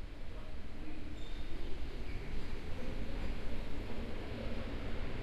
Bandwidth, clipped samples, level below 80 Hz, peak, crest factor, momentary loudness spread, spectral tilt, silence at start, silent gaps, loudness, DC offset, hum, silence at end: 7.6 kHz; under 0.1%; -42 dBFS; -24 dBFS; 10 dB; 6 LU; -6.5 dB/octave; 0 s; none; -46 LUFS; under 0.1%; none; 0 s